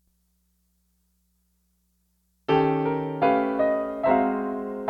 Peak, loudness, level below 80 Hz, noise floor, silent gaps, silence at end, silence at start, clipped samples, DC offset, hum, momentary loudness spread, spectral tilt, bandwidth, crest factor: -8 dBFS; -24 LUFS; -58 dBFS; -70 dBFS; none; 0 s; 2.5 s; under 0.1%; under 0.1%; 60 Hz at -65 dBFS; 6 LU; -8.5 dB/octave; 5.4 kHz; 18 dB